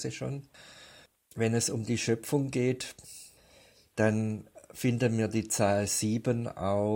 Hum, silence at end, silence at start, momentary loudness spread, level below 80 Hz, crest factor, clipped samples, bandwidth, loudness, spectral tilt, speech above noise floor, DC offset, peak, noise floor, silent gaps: none; 0 s; 0 s; 19 LU; -64 dBFS; 18 dB; under 0.1%; 17 kHz; -30 LUFS; -5 dB/octave; 30 dB; under 0.1%; -12 dBFS; -60 dBFS; none